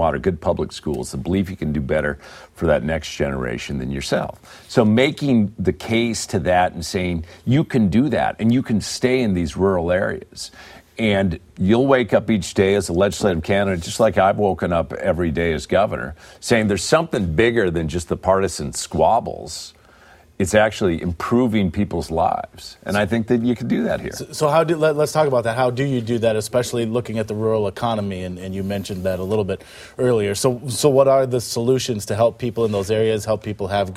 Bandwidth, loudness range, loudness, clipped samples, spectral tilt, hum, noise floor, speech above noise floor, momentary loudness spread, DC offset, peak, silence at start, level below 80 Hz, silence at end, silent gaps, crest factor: 15.5 kHz; 4 LU; -20 LUFS; under 0.1%; -5.5 dB/octave; none; -49 dBFS; 29 dB; 9 LU; under 0.1%; -2 dBFS; 0 s; -42 dBFS; 0 s; none; 18 dB